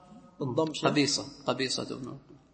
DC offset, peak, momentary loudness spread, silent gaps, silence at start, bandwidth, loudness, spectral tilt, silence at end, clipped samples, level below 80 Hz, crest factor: under 0.1%; -10 dBFS; 14 LU; none; 0.1 s; 8.8 kHz; -30 LUFS; -4 dB/octave; 0.15 s; under 0.1%; -66 dBFS; 22 dB